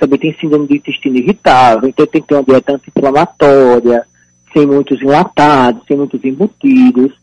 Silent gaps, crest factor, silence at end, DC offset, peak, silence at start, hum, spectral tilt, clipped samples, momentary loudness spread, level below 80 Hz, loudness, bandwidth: none; 10 dB; 0.1 s; under 0.1%; 0 dBFS; 0 s; none; -7 dB/octave; under 0.1%; 8 LU; -44 dBFS; -10 LUFS; 9.4 kHz